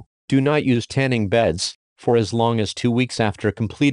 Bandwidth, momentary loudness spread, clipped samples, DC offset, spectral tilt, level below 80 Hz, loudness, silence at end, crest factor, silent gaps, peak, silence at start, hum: 11 kHz; 6 LU; under 0.1%; under 0.1%; -6 dB/octave; -50 dBFS; -20 LUFS; 0 s; 16 dB; 1.75-1.96 s; -4 dBFS; 0.3 s; none